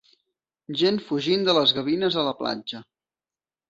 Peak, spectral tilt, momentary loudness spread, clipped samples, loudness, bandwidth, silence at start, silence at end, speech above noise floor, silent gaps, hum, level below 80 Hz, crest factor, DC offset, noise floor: -6 dBFS; -5.5 dB/octave; 13 LU; under 0.1%; -23 LUFS; 7.8 kHz; 0.7 s; 0.85 s; over 67 dB; none; none; -66 dBFS; 20 dB; under 0.1%; under -90 dBFS